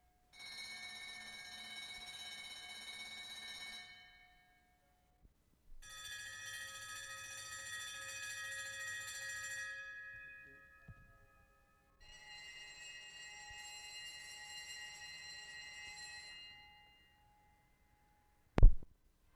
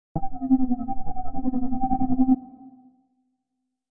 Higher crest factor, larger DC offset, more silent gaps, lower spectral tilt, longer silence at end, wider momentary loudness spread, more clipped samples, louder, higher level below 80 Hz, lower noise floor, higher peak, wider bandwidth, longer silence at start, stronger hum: first, 30 dB vs 16 dB; neither; neither; second, -3 dB/octave vs -14.5 dB/octave; first, 0.45 s vs 0.05 s; first, 15 LU vs 12 LU; neither; second, -45 LUFS vs -26 LUFS; about the same, -42 dBFS vs -38 dBFS; second, -74 dBFS vs -80 dBFS; second, -12 dBFS vs -8 dBFS; first, 13.5 kHz vs 1.6 kHz; first, 0.35 s vs 0.15 s; neither